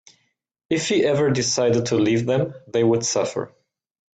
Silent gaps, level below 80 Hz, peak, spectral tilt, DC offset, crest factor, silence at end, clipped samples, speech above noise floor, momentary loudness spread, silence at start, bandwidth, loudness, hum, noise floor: none; -60 dBFS; -8 dBFS; -4.5 dB/octave; under 0.1%; 14 dB; 0.7 s; under 0.1%; 46 dB; 7 LU; 0.7 s; 9.2 kHz; -21 LUFS; none; -66 dBFS